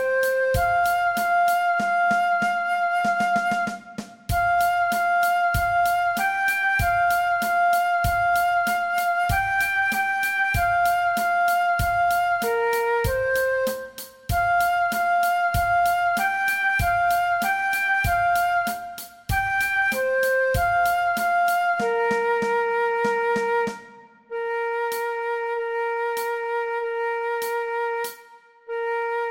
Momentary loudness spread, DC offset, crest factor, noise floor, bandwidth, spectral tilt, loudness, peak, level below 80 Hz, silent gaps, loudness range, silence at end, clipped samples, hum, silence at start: 6 LU; under 0.1%; 12 dB; -50 dBFS; 17 kHz; -4 dB/octave; -22 LUFS; -10 dBFS; -42 dBFS; none; 5 LU; 0 s; under 0.1%; none; 0 s